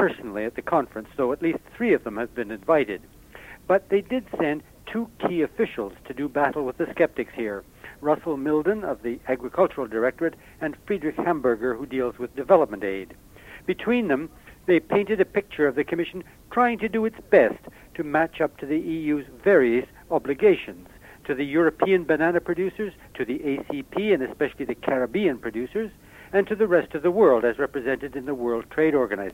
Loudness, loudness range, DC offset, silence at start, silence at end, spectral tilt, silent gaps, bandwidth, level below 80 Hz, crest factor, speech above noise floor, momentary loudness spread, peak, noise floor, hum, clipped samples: -24 LUFS; 4 LU; under 0.1%; 0 s; 0 s; -7 dB/octave; none; 16 kHz; -54 dBFS; 22 dB; 22 dB; 13 LU; -4 dBFS; -45 dBFS; none; under 0.1%